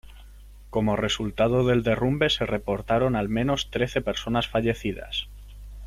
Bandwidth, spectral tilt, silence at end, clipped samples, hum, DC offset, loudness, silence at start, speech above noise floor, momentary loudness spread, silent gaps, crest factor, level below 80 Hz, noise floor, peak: 15 kHz; -5.5 dB/octave; 0 s; under 0.1%; 50 Hz at -40 dBFS; under 0.1%; -25 LUFS; 0.1 s; 21 dB; 9 LU; none; 16 dB; -42 dBFS; -46 dBFS; -10 dBFS